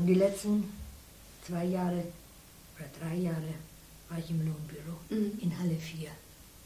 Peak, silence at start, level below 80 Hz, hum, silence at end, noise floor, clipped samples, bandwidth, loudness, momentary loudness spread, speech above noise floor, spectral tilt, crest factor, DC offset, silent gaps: -16 dBFS; 0 s; -56 dBFS; none; 0 s; -54 dBFS; under 0.1%; 16 kHz; -34 LUFS; 20 LU; 21 dB; -7 dB/octave; 18 dB; under 0.1%; none